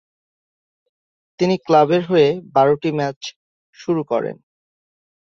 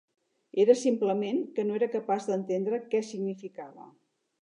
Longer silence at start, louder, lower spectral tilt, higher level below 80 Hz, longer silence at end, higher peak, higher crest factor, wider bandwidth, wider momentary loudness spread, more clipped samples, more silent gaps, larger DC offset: first, 1.4 s vs 0.55 s; first, -18 LUFS vs -28 LUFS; about the same, -6.5 dB/octave vs -6 dB/octave; first, -64 dBFS vs -88 dBFS; first, 1.05 s vs 0.55 s; first, -2 dBFS vs -8 dBFS; about the same, 18 dB vs 20 dB; second, 7.2 kHz vs 10.5 kHz; about the same, 15 LU vs 15 LU; neither; first, 3.16-3.21 s, 3.36-3.73 s vs none; neither